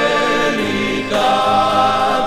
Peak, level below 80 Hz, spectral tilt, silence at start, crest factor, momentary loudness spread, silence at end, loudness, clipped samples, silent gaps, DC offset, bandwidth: -2 dBFS; -42 dBFS; -4 dB/octave; 0 s; 12 dB; 4 LU; 0 s; -15 LUFS; under 0.1%; none; under 0.1%; 15 kHz